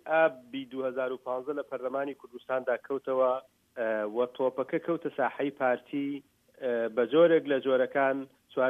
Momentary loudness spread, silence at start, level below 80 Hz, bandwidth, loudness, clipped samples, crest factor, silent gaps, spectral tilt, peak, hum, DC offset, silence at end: 11 LU; 0.05 s; -82 dBFS; 3.8 kHz; -30 LUFS; under 0.1%; 18 dB; none; -7 dB/octave; -12 dBFS; none; under 0.1%; 0 s